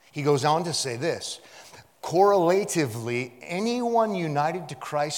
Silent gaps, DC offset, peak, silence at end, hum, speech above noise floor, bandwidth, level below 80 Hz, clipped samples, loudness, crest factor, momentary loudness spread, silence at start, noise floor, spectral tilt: none; under 0.1%; -8 dBFS; 0 s; none; 24 dB; 18 kHz; -74 dBFS; under 0.1%; -25 LUFS; 18 dB; 12 LU; 0.15 s; -49 dBFS; -4.5 dB/octave